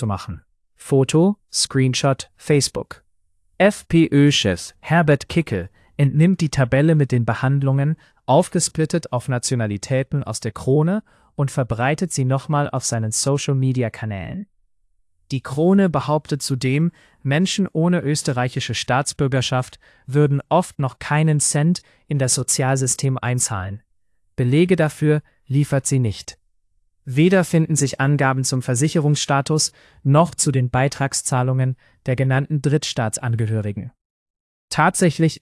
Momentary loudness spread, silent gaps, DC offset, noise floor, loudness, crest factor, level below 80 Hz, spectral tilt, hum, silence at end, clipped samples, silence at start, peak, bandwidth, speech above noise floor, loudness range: 10 LU; 34.05-34.34 s, 34.40-34.68 s; under 0.1%; -67 dBFS; -19 LUFS; 16 dB; -52 dBFS; -5 dB/octave; none; 0.05 s; under 0.1%; 0 s; -4 dBFS; 12 kHz; 48 dB; 3 LU